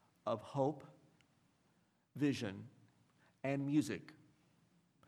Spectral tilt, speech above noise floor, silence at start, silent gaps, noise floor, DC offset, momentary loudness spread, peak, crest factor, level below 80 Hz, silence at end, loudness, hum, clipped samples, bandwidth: -6.5 dB/octave; 38 dB; 0.25 s; none; -76 dBFS; under 0.1%; 19 LU; -22 dBFS; 20 dB; -86 dBFS; 0.95 s; -40 LUFS; none; under 0.1%; 13.5 kHz